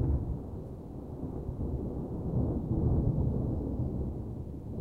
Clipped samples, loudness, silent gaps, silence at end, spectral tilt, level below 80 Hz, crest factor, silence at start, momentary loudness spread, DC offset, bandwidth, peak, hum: under 0.1%; -34 LUFS; none; 0 s; -12 dB/octave; -38 dBFS; 16 dB; 0 s; 12 LU; under 0.1%; 2 kHz; -18 dBFS; none